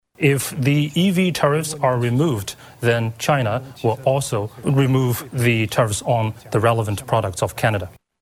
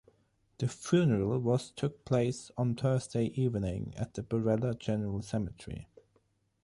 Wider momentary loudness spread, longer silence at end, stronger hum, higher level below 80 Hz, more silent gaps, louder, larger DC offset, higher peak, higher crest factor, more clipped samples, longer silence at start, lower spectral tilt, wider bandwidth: second, 6 LU vs 10 LU; second, 0.35 s vs 0.8 s; neither; first, -50 dBFS vs -56 dBFS; neither; first, -20 LUFS vs -32 LUFS; neither; first, -2 dBFS vs -14 dBFS; about the same, 16 dB vs 18 dB; neither; second, 0.2 s vs 0.6 s; second, -5.5 dB/octave vs -7 dB/octave; first, 16.5 kHz vs 11.5 kHz